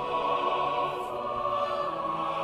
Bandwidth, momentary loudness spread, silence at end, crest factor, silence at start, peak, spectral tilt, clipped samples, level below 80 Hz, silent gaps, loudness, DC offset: 13.5 kHz; 4 LU; 0 s; 14 dB; 0 s; -16 dBFS; -5 dB/octave; under 0.1%; -60 dBFS; none; -29 LUFS; under 0.1%